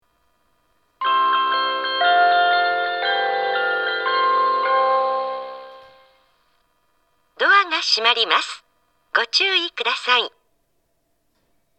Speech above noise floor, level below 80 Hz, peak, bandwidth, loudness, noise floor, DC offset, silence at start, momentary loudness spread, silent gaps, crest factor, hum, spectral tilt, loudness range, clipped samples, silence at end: 50 dB; -76 dBFS; 0 dBFS; 8.8 kHz; -18 LUFS; -69 dBFS; under 0.1%; 1 s; 10 LU; none; 20 dB; none; 0.5 dB/octave; 4 LU; under 0.1%; 1.5 s